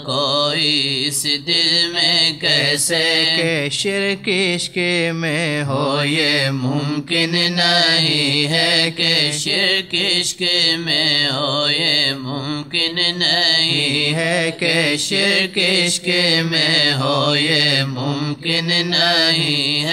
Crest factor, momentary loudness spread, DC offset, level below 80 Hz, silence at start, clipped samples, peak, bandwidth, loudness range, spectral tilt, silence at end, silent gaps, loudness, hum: 14 dB; 6 LU; under 0.1%; -60 dBFS; 0 s; under 0.1%; -2 dBFS; 15.5 kHz; 3 LU; -3 dB/octave; 0 s; none; -15 LUFS; none